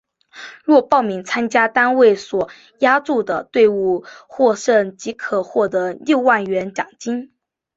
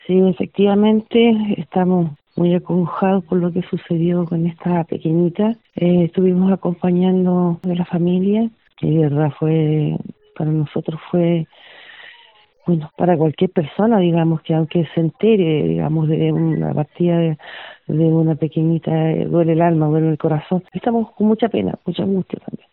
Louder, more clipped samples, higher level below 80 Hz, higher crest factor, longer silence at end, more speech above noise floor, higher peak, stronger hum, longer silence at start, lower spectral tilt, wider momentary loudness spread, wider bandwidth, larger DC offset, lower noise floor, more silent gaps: about the same, -17 LUFS vs -18 LUFS; neither; second, -62 dBFS vs -54 dBFS; about the same, 16 dB vs 14 dB; first, 0.5 s vs 0.15 s; second, 22 dB vs 34 dB; about the same, -2 dBFS vs -2 dBFS; neither; first, 0.35 s vs 0.1 s; second, -4.5 dB/octave vs -12.5 dB/octave; first, 12 LU vs 7 LU; first, 8 kHz vs 4.1 kHz; neither; second, -39 dBFS vs -50 dBFS; neither